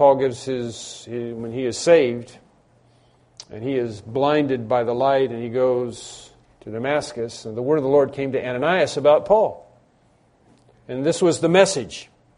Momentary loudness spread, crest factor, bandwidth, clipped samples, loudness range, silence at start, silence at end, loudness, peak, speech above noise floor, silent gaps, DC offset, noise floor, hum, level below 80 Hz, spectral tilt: 16 LU; 22 dB; 10.5 kHz; under 0.1%; 4 LU; 0 s; 0.35 s; -21 LUFS; 0 dBFS; 38 dB; none; under 0.1%; -59 dBFS; none; -58 dBFS; -5 dB/octave